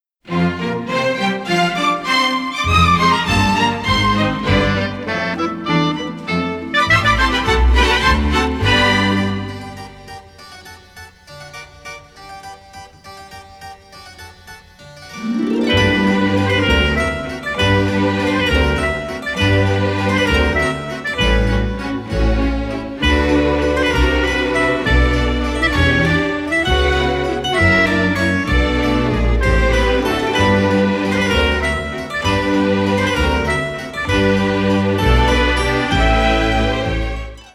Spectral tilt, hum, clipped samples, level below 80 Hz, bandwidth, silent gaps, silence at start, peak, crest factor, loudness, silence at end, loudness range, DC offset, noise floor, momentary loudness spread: -5.5 dB/octave; none; under 0.1%; -24 dBFS; 14 kHz; none; 0.25 s; -2 dBFS; 14 dB; -16 LUFS; 0.05 s; 12 LU; under 0.1%; -40 dBFS; 15 LU